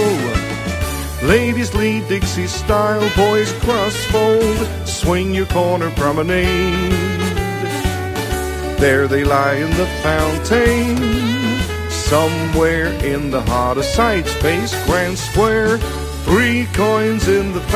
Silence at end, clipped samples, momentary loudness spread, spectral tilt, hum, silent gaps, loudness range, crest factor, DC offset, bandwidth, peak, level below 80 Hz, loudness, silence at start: 0 s; under 0.1%; 6 LU; -5 dB/octave; none; none; 1 LU; 16 dB; under 0.1%; 16 kHz; 0 dBFS; -26 dBFS; -16 LUFS; 0 s